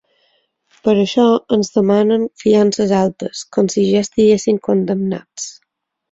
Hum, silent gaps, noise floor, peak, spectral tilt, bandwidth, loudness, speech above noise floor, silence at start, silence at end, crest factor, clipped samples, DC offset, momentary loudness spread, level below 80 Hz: none; none; -71 dBFS; -2 dBFS; -6 dB/octave; 8 kHz; -15 LUFS; 57 dB; 0.85 s; 0.6 s; 14 dB; under 0.1%; under 0.1%; 10 LU; -54 dBFS